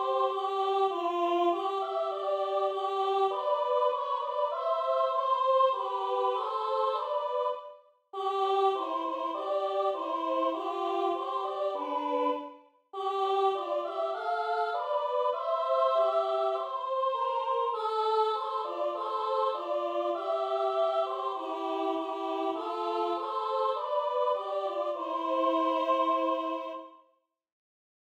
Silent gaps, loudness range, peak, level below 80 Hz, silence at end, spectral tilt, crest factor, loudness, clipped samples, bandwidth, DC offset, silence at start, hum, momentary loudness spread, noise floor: none; 3 LU; -14 dBFS; under -90 dBFS; 1.15 s; -3 dB/octave; 16 dB; -30 LUFS; under 0.1%; 9.4 kHz; under 0.1%; 0 s; none; 6 LU; -72 dBFS